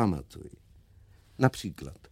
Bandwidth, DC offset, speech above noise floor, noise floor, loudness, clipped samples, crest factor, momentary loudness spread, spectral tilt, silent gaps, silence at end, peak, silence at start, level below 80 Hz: 16 kHz; under 0.1%; 27 dB; -57 dBFS; -30 LUFS; under 0.1%; 26 dB; 22 LU; -6.5 dB/octave; none; 0.15 s; -6 dBFS; 0 s; -52 dBFS